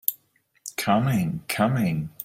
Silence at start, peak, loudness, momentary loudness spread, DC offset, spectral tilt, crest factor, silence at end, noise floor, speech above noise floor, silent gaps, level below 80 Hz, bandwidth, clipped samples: 0.1 s; -2 dBFS; -25 LUFS; 10 LU; under 0.1%; -5.5 dB/octave; 22 dB; 0 s; -65 dBFS; 41 dB; none; -58 dBFS; 16 kHz; under 0.1%